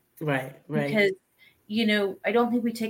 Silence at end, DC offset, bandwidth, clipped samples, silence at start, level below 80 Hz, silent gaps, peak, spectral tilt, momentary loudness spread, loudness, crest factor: 0 s; under 0.1%; 17 kHz; under 0.1%; 0.2 s; -72 dBFS; none; -10 dBFS; -6 dB/octave; 8 LU; -26 LUFS; 18 dB